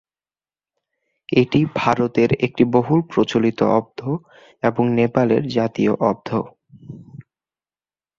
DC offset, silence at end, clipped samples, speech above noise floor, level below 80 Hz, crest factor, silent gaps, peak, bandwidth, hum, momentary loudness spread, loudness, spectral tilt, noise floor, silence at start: under 0.1%; 1 s; under 0.1%; over 71 dB; -54 dBFS; 18 dB; none; -2 dBFS; 7.4 kHz; none; 10 LU; -19 LUFS; -7.5 dB/octave; under -90 dBFS; 1.3 s